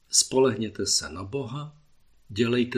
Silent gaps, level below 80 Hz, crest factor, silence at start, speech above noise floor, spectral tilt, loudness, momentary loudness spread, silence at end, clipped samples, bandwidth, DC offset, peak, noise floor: none; -58 dBFS; 22 dB; 0.1 s; 32 dB; -3 dB/octave; -25 LUFS; 16 LU; 0 s; under 0.1%; 15 kHz; under 0.1%; -4 dBFS; -57 dBFS